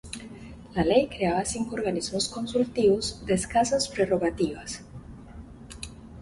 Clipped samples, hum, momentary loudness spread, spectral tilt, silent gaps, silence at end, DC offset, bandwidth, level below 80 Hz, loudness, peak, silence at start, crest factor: under 0.1%; none; 21 LU; -4.5 dB/octave; none; 0 s; under 0.1%; 11.5 kHz; -48 dBFS; -26 LUFS; -8 dBFS; 0.05 s; 20 dB